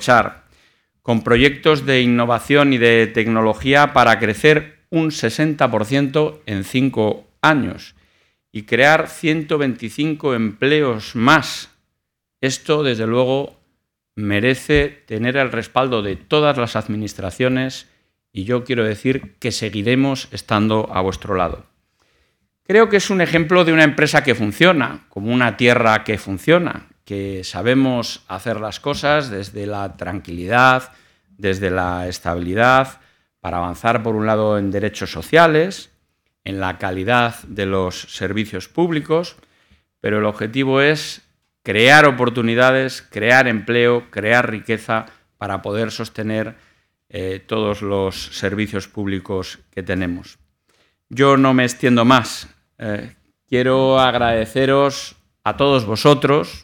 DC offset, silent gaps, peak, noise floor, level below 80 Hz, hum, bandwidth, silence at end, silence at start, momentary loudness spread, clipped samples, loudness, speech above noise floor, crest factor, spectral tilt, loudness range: under 0.1%; none; 0 dBFS; -77 dBFS; -46 dBFS; none; 19 kHz; 0.05 s; 0 s; 14 LU; under 0.1%; -17 LUFS; 60 dB; 18 dB; -5.5 dB/octave; 7 LU